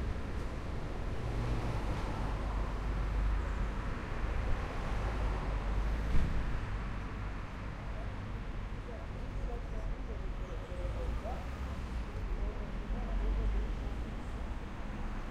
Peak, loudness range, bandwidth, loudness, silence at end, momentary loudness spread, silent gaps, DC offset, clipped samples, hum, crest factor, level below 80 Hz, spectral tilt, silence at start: -16 dBFS; 5 LU; 9.4 kHz; -39 LUFS; 0 s; 7 LU; none; under 0.1%; under 0.1%; none; 18 dB; -36 dBFS; -7 dB/octave; 0 s